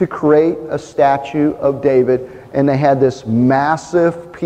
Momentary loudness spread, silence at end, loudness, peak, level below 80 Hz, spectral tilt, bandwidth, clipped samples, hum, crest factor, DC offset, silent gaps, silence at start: 5 LU; 0 s; -15 LUFS; -2 dBFS; -50 dBFS; -7.5 dB/octave; 9.2 kHz; under 0.1%; none; 12 dB; under 0.1%; none; 0 s